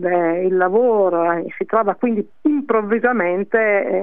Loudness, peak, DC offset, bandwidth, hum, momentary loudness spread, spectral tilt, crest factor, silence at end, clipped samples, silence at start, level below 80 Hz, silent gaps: -18 LUFS; -4 dBFS; 0.7%; 3.8 kHz; none; 5 LU; -10.5 dB/octave; 14 dB; 0 s; under 0.1%; 0 s; -70 dBFS; none